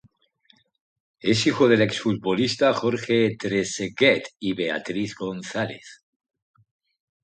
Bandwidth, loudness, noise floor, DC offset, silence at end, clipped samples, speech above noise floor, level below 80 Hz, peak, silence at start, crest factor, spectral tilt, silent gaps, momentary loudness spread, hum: 9.4 kHz; -23 LUFS; -62 dBFS; under 0.1%; 1.3 s; under 0.1%; 39 dB; -62 dBFS; -4 dBFS; 1.25 s; 20 dB; -4.5 dB/octave; none; 11 LU; none